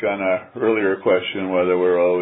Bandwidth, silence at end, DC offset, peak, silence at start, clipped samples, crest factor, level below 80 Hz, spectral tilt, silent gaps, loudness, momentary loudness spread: 3.9 kHz; 0 s; under 0.1%; -4 dBFS; 0 s; under 0.1%; 14 dB; -62 dBFS; -10 dB/octave; none; -19 LUFS; 5 LU